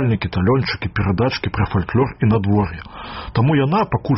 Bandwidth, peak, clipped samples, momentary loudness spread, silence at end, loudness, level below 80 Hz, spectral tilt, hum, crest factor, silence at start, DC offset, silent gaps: 6 kHz; -6 dBFS; under 0.1%; 8 LU; 0 s; -19 LUFS; -36 dBFS; -6.5 dB/octave; none; 12 dB; 0 s; under 0.1%; none